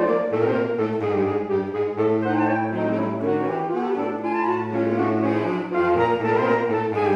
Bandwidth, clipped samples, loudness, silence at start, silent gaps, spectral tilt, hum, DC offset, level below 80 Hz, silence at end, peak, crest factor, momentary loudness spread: 7 kHz; under 0.1%; -22 LUFS; 0 s; none; -8.5 dB/octave; none; under 0.1%; -62 dBFS; 0 s; -8 dBFS; 14 dB; 4 LU